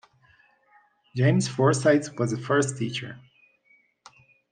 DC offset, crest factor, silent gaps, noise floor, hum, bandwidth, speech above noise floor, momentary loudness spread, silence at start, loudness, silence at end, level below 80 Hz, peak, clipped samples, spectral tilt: under 0.1%; 20 dB; none; -64 dBFS; none; 9.8 kHz; 40 dB; 12 LU; 1.15 s; -24 LUFS; 1.3 s; -70 dBFS; -8 dBFS; under 0.1%; -5.5 dB/octave